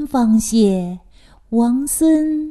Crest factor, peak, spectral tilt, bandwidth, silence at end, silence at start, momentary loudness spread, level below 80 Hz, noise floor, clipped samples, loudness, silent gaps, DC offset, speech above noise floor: 14 dB; -4 dBFS; -5.5 dB/octave; 13 kHz; 0 s; 0 s; 9 LU; -44 dBFS; -39 dBFS; under 0.1%; -16 LUFS; none; under 0.1%; 23 dB